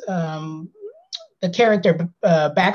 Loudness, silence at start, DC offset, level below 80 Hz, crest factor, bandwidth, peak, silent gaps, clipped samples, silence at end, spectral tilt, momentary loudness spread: -19 LUFS; 0 s; under 0.1%; -66 dBFS; 16 dB; 7 kHz; -4 dBFS; none; under 0.1%; 0 s; -6.5 dB/octave; 18 LU